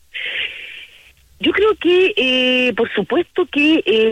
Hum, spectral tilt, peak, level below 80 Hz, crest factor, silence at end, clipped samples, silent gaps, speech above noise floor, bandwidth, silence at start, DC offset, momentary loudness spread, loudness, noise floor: none; -4.5 dB/octave; -6 dBFS; -54 dBFS; 12 dB; 0 s; under 0.1%; none; 32 dB; 11 kHz; 0.15 s; under 0.1%; 11 LU; -16 LUFS; -47 dBFS